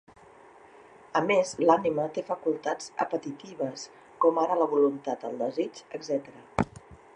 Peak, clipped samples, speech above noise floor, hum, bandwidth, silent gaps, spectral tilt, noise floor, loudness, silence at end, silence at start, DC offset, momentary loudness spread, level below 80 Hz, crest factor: -6 dBFS; under 0.1%; 26 dB; none; 10.5 kHz; none; -5.5 dB/octave; -53 dBFS; -28 LUFS; 0.2 s; 1.15 s; under 0.1%; 11 LU; -60 dBFS; 22 dB